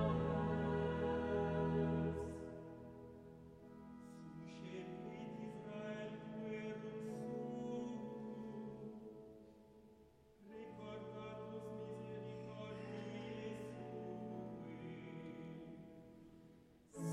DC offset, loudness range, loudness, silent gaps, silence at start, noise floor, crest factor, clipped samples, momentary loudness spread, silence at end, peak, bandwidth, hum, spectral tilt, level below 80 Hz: under 0.1%; 11 LU; -46 LUFS; none; 0 s; -67 dBFS; 18 dB; under 0.1%; 20 LU; 0 s; -28 dBFS; 11 kHz; none; -7.5 dB/octave; -64 dBFS